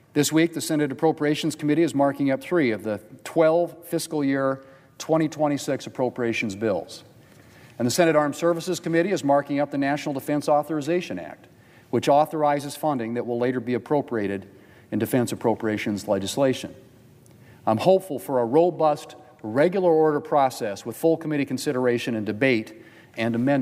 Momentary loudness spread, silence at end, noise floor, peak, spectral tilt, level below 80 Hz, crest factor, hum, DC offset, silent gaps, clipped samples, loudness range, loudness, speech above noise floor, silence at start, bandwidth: 10 LU; 0 s; -51 dBFS; -4 dBFS; -5.5 dB/octave; -68 dBFS; 20 dB; none; under 0.1%; none; under 0.1%; 4 LU; -24 LUFS; 28 dB; 0.15 s; 16 kHz